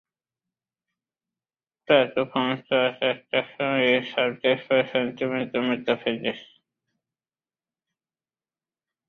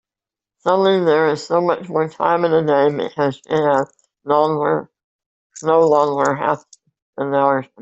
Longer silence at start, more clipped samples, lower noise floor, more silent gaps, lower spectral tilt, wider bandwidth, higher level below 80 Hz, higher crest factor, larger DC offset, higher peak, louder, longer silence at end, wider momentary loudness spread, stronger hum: first, 1.9 s vs 0.65 s; neither; about the same, under -90 dBFS vs -89 dBFS; second, none vs 5.04-5.19 s, 5.26-5.50 s, 7.02-7.13 s; about the same, -7 dB/octave vs -6 dB/octave; second, 6.2 kHz vs 8.2 kHz; second, -70 dBFS vs -62 dBFS; first, 22 dB vs 16 dB; neither; about the same, -4 dBFS vs -2 dBFS; second, -24 LUFS vs -18 LUFS; first, 2.65 s vs 0.2 s; about the same, 7 LU vs 9 LU; neither